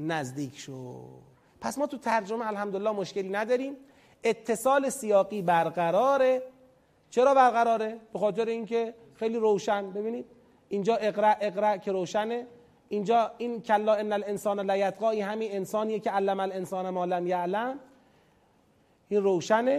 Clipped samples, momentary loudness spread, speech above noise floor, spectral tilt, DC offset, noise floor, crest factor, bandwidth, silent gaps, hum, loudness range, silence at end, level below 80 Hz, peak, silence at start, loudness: under 0.1%; 11 LU; 37 dB; -5 dB/octave; under 0.1%; -65 dBFS; 18 dB; 15.5 kHz; none; none; 6 LU; 0 s; -72 dBFS; -10 dBFS; 0 s; -28 LUFS